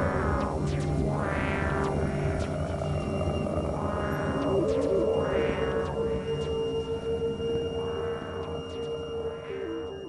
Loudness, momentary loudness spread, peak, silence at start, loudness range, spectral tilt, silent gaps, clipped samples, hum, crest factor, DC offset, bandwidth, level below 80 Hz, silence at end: -30 LUFS; 8 LU; -14 dBFS; 0 s; 4 LU; -7 dB/octave; none; under 0.1%; none; 14 dB; under 0.1%; 12 kHz; -42 dBFS; 0 s